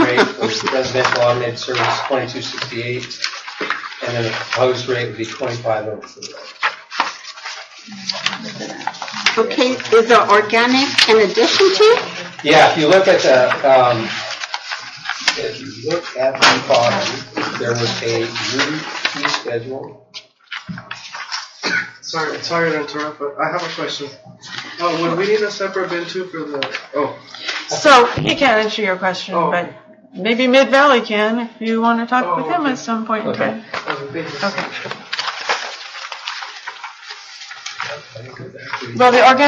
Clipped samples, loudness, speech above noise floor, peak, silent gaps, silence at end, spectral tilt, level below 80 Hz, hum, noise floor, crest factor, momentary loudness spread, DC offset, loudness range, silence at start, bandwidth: under 0.1%; -17 LUFS; 23 dB; 0 dBFS; none; 0 s; -3.5 dB/octave; -60 dBFS; none; -39 dBFS; 18 dB; 18 LU; under 0.1%; 11 LU; 0 s; 11 kHz